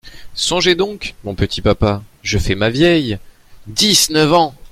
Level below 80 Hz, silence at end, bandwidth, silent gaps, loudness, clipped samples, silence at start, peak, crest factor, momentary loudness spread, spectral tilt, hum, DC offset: -32 dBFS; 0.2 s; 16 kHz; none; -15 LUFS; under 0.1%; 0.05 s; 0 dBFS; 16 dB; 13 LU; -3.5 dB/octave; none; under 0.1%